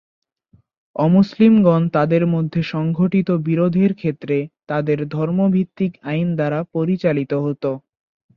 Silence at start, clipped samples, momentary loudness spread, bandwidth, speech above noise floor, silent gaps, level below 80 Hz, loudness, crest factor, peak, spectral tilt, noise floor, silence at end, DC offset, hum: 0.95 s; under 0.1%; 9 LU; 6 kHz; 40 dB; none; -56 dBFS; -18 LUFS; 14 dB; -4 dBFS; -10 dB/octave; -57 dBFS; 0.6 s; under 0.1%; none